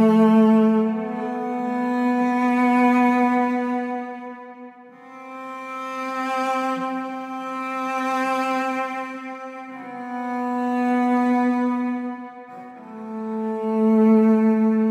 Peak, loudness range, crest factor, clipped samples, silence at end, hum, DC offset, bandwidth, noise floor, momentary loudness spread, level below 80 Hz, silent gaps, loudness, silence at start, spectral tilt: -6 dBFS; 8 LU; 14 dB; under 0.1%; 0 s; none; under 0.1%; 10.5 kHz; -43 dBFS; 19 LU; -78 dBFS; none; -21 LUFS; 0 s; -7 dB/octave